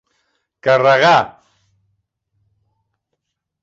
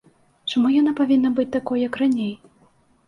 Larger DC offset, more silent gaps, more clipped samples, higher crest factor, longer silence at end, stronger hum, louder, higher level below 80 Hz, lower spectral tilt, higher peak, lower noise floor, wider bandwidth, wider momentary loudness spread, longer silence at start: neither; neither; neither; first, 18 dB vs 12 dB; first, 2.35 s vs 0.7 s; neither; first, -13 LUFS vs -21 LUFS; about the same, -62 dBFS vs -62 dBFS; second, -4.5 dB/octave vs -6 dB/octave; first, 0 dBFS vs -8 dBFS; first, -76 dBFS vs -58 dBFS; second, 7.8 kHz vs 10.5 kHz; about the same, 12 LU vs 11 LU; first, 0.65 s vs 0.45 s